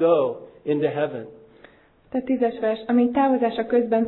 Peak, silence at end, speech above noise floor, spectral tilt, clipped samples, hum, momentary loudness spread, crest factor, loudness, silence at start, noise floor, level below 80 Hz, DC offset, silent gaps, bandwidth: -6 dBFS; 0 s; 31 dB; -10.5 dB/octave; under 0.1%; none; 11 LU; 16 dB; -23 LUFS; 0 s; -52 dBFS; -62 dBFS; under 0.1%; none; 4.2 kHz